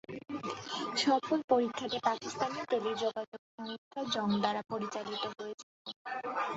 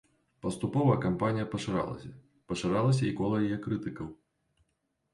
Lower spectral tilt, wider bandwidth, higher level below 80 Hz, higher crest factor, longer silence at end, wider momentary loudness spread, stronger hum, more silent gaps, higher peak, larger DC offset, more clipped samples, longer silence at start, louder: second, -2.5 dB/octave vs -7 dB/octave; second, 8 kHz vs 11.5 kHz; second, -76 dBFS vs -58 dBFS; about the same, 20 dB vs 18 dB; second, 0 s vs 1 s; about the same, 14 LU vs 13 LU; neither; first, 1.44-1.48 s, 3.28-3.32 s, 3.39-3.58 s, 3.78-3.91 s, 5.54-5.85 s, 5.96-6.05 s vs none; about the same, -14 dBFS vs -14 dBFS; neither; neither; second, 0.1 s vs 0.45 s; second, -34 LUFS vs -31 LUFS